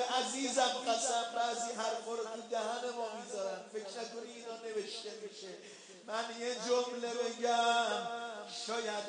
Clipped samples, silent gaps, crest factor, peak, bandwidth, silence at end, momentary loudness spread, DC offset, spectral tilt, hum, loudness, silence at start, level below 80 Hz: under 0.1%; none; 18 dB; -20 dBFS; 10.5 kHz; 0 s; 14 LU; under 0.1%; -1 dB/octave; none; -37 LUFS; 0 s; under -90 dBFS